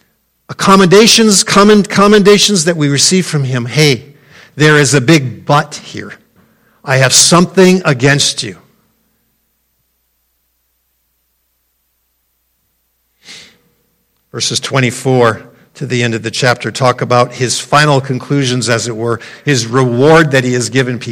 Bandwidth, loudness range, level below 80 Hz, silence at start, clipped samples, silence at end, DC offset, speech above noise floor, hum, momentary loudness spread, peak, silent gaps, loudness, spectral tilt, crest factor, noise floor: over 20 kHz; 9 LU; -48 dBFS; 0.5 s; 0.3%; 0 s; under 0.1%; 52 dB; none; 12 LU; 0 dBFS; none; -9 LUFS; -4 dB/octave; 12 dB; -62 dBFS